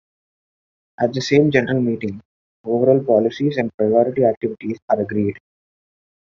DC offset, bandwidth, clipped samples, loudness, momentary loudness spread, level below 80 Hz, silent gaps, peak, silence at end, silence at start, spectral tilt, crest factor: under 0.1%; 7.6 kHz; under 0.1%; -19 LUFS; 11 LU; -60 dBFS; 2.25-2.64 s, 3.74-3.78 s, 4.37-4.41 s, 4.82-4.88 s; -2 dBFS; 1 s; 1 s; -6 dB/octave; 18 dB